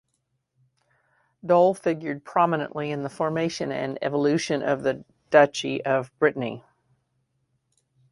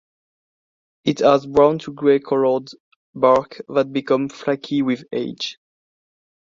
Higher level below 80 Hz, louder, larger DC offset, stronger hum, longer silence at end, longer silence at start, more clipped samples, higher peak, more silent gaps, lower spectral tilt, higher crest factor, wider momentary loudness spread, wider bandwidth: second, -66 dBFS vs -58 dBFS; second, -24 LUFS vs -19 LUFS; neither; neither; first, 1.55 s vs 1.05 s; first, 1.45 s vs 1.05 s; neither; about the same, -2 dBFS vs -2 dBFS; second, none vs 2.80-3.13 s; about the same, -5.5 dB/octave vs -6 dB/octave; about the same, 22 dB vs 20 dB; about the same, 11 LU vs 9 LU; first, 11.5 kHz vs 7.6 kHz